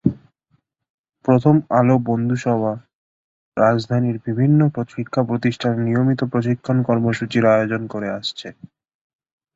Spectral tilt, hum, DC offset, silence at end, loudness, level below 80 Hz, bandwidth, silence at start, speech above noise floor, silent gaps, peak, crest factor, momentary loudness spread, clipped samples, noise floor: -8 dB/octave; none; under 0.1%; 1.05 s; -19 LUFS; -54 dBFS; 7.8 kHz; 0.05 s; 48 dB; 0.90-1.04 s, 2.95-3.52 s; -2 dBFS; 18 dB; 11 LU; under 0.1%; -66 dBFS